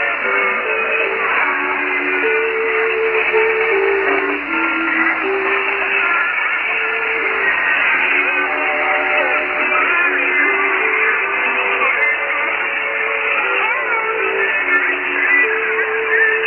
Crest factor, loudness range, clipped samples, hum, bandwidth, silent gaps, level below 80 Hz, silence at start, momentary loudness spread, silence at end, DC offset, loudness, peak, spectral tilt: 14 dB; 2 LU; under 0.1%; none; 5 kHz; none; -54 dBFS; 0 s; 3 LU; 0 s; under 0.1%; -15 LUFS; -4 dBFS; -6 dB/octave